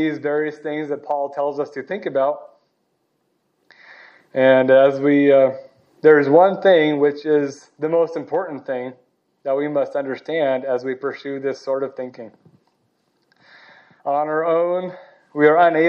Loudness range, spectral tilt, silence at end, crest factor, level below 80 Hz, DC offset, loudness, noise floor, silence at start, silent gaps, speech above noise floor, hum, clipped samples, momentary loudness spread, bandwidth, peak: 12 LU; -7 dB/octave; 0 s; 18 dB; -82 dBFS; under 0.1%; -19 LUFS; -69 dBFS; 0 s; none; 51 dB; none; under 0.1%; 15 LU; 7 kHz; -2 dBFS